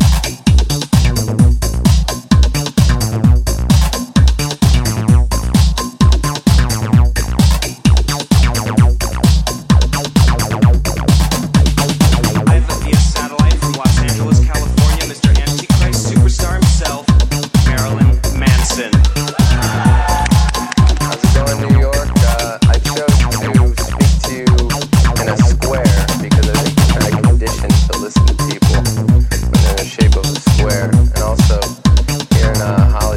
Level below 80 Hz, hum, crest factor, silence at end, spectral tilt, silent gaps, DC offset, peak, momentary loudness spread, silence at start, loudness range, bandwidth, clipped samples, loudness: -14 dBFS; none; 12 dB; 0 s; -5.5 dB/octave; none; under 0.1%; 0 dBFS; 2 LU; 0 s; 1 LU; 16 kHz; under 0.1%; -13 LUFS